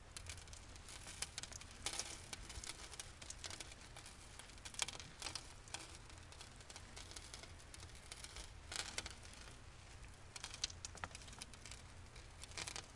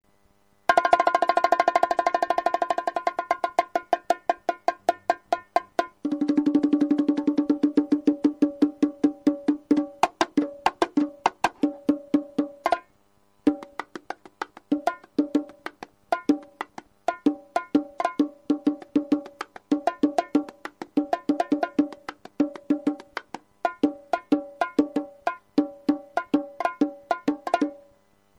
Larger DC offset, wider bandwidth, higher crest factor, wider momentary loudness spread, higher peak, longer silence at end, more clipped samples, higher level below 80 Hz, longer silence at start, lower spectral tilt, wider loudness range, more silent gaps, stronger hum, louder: neither; about the same, 11.5 kHz vs 11 kHz; first, 34 dB vs 20 dB; about the same, 12 LU vs 10 LU; second, -18 dBFS vs -6 dBFS; second, 0 s vs 0.6 s; neither; about the same, -62 dBFS vs -66 dBFS; second, 0 s vs 0.7 s; second, -1.5 dB/octave vs -5 dB/octave; about the same, 3 LU vs 5 LU; neither; neither; second, -50 LUFS vs -25 LUFS